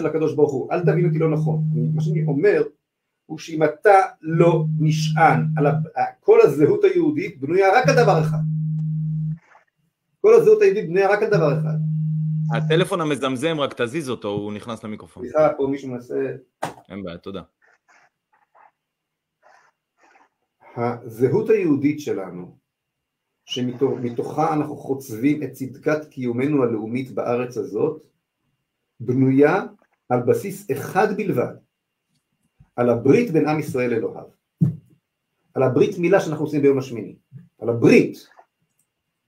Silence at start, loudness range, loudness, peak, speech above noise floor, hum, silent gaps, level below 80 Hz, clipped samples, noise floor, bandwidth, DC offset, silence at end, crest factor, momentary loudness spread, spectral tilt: 0 s; 8 LU; -20 LUFS; -2 dBFS; 61 dB; none; none; -62 dBFS; under 0.1%; -80 dBFS; 16 kHz; under 0.1%; 1.1 s; 20 dB; 16 LU; -7.5 dB/octave